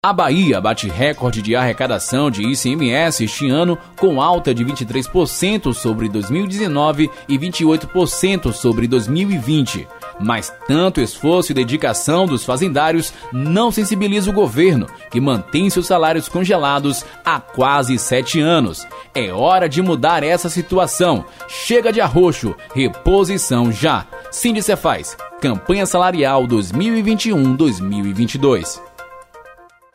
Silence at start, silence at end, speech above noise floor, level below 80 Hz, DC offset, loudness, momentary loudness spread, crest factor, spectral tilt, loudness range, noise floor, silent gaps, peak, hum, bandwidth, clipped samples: 0.05 s; 0.4 s; 28 dB; -38 dBFS; under 0.1%; -16 LUFS; 7 LU; 14 dB; -5 dB/octave; 2 LU; -44 dBFS; none; -2 dBFS; none; 16 kHz; under 0.1%